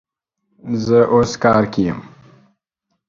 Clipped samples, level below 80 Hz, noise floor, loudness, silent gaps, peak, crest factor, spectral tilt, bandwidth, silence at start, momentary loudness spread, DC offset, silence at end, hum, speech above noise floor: under 0.1%; -48 dBFS; -74 dBFS; -16 LUFS; none; 0 dBFS; 18 dB; -6.5 dB/octave; 7.6 kHz; 0.65 s; 14 LU; under 0.1%; 1.05 s; none; 59 dB